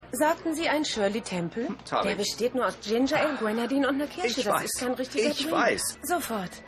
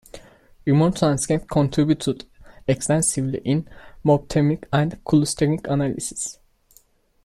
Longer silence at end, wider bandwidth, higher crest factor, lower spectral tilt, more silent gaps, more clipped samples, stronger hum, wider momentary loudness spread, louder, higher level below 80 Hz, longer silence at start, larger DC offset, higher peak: second, 0 s vs 0.9 s; first, 15.5 kHz vs 13.5 kHz; about the same, 16 dB vs 16 dB; second, -3.5 dB/octave vs -5.5 dB/octave; neither; neither; neither; second, 5 LU vs 9 LU; second, -27 LUFS vs -22 LUFS; second, -58 dBFS vs -46 dBFS; second, 0 s vs 0.15 s; neither; second, -12 dBFS vs -6 dBFS